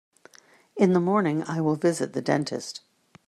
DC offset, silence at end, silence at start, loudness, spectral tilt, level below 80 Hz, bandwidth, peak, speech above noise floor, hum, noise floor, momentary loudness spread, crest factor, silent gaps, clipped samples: under 0.1%; 0.5 s; 0.75 s; -25 LUFS; -6 dB/octave; -70 dBFS; 13.5 kHz; -8 dBFS; 32 dB; none; -56 dBFS; 15 LU; 18 dB; none; under 0.1%